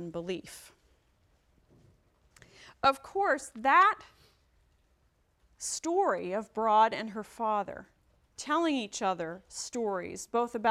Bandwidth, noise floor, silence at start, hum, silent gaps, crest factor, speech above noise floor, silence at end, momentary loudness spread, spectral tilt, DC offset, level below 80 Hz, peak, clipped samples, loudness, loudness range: 15 kHz; -71 dBFS; 0 s; none; none; 22 dB; 41 dB; 0 s; 15 LU; -3 dB/octave; under 0.1%; -68 dBFS; -12 dBFS; under 0.1%; -30 LUFS; 4 LU